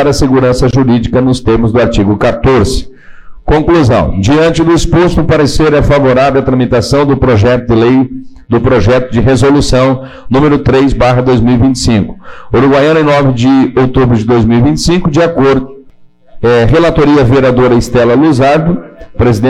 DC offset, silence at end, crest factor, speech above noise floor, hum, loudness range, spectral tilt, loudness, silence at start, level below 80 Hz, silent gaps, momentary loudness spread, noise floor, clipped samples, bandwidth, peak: under 0.1%; 0 s; 6 dB; 30 dB; none; 1 LU; -6.5 dB/octave; -8 LUFS; 0 s; -22 dBFS; none; 5 LU; -37 dBFS; under 0.1%; 13 kHz; -2 dBFS